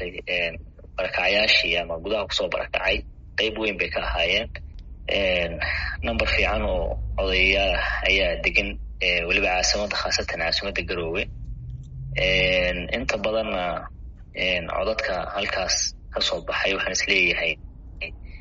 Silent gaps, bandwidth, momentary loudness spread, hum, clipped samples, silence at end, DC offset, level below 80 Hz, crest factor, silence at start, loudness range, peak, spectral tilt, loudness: none; 7.6 kHz; 15 LU; none; under 0.1%; 0 s; under 0.1%; -36 dBFS; 20 dB; 0 s; 4 LU; -4 dBFS; -1 dB/octave; -23 LUFS